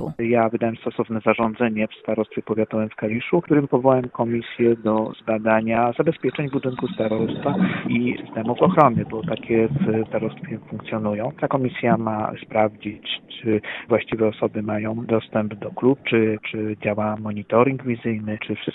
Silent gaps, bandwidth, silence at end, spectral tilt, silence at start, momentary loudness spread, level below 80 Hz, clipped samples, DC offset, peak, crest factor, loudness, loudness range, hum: none; 4.1 kHz; 0 s; -10 dB/octave; 0 s; 8 LU; -56 dBFS; under 0.1%; under 0.1%; 0 dBFS; 22 dB; -22 LUFS; 3 LU; none